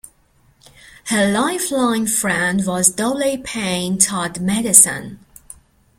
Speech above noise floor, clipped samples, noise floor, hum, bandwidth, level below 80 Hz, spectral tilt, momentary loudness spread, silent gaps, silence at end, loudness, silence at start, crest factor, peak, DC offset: 39 dB; under 0.1%; -56 dBFS; none; 16.5 kHz; -52 dBFS; -3 dB/octave; 12 LU; none; 0.85 s; -16 LUFS; 1.05 s; 20 dB; 0 dBFS; under 0.1%